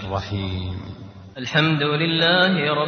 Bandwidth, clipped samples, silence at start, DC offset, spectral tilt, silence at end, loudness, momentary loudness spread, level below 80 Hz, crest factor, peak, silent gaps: 6.6 kHz; under 0.1%; 0 s; under 0.1%; -6 dB/octave; 0 s; -20 LUFS; 20 LU; -48 dBFS; 18 dB; -4 dBFS; none